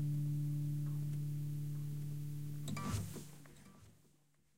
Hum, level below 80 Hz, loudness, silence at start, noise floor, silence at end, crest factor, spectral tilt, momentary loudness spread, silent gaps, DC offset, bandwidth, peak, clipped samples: none; -64 dBFS; -42 LUFS; 0 s; -74 dBFS; 0 s; 14 dB; -6.5 dB/octave; 18 LU; none; 0.3%; 16 kHz; -28 dBFS; under 0.1%